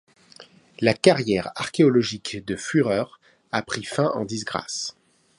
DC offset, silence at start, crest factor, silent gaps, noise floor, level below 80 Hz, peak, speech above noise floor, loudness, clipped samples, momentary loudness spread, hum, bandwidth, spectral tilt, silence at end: under 0.1%; 0.4 s; 22 dB; none; -50 dBFS; -58 dBFS; -2 dBFS; 27 dB; -23 LUFS; under 0.1%; 11 LU; none; 11.5 kHz; -5 dB/octave; 0.45 s